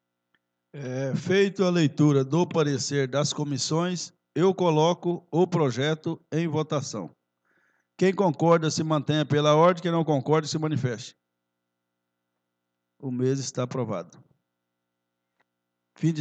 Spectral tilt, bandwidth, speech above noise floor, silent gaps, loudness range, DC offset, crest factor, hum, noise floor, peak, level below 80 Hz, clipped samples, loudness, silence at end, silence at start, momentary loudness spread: -6 dB/octave; 9 kHz; 57 dB; none; 10 LU; under 0.1%; 20 dB; 60 Hz at -55 dBFS; -82 dBFS; -6 dBFS; -78 dBFS; under 0.1%; -25 LUFS; 0 s; 0.75 s; 12 LU